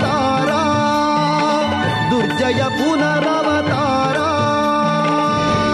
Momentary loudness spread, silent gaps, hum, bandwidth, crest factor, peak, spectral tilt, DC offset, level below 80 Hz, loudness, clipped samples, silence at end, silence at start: 1 LU; none; none; 13 kHz; 10 dB; -6 dBFS; -5.5 dB/octave; under 0.1%; -46 dBFS; -16 LUFS; under 0.1%; 0 s; 0 s